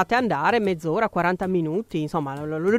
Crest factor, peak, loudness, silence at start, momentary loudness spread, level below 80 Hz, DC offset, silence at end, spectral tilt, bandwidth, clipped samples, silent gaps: 16 dB; -6 dBFS; -24 LUFS; 0 s; 6 LU; -54 dBFS; under 0.1%; 0 s; -7 dB/octave; 15 kHz; under 0.1%; none